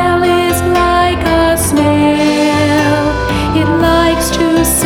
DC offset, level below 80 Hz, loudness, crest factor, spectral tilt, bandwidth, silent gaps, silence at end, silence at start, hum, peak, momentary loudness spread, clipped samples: under 0.1%; -26 dBFS; -11 LUFS; 10 dB; -4.5 dB/octave; 18 kHz; none; 0 s; 0 s; none; 0 dBFS; 3 LU; under 0.1%